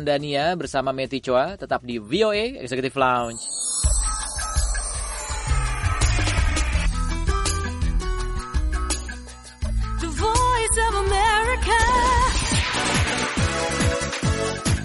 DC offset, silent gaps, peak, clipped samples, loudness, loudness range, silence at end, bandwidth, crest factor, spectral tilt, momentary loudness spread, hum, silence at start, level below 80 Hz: under 0.1%; none; -6 dBFS; under 0.1%; -23 LUFS; 5 LU; 0 s; 11.5 kHz; 16 dB; -3.5 dB/octave; 8 LU; none; 0 s; -26 dBFS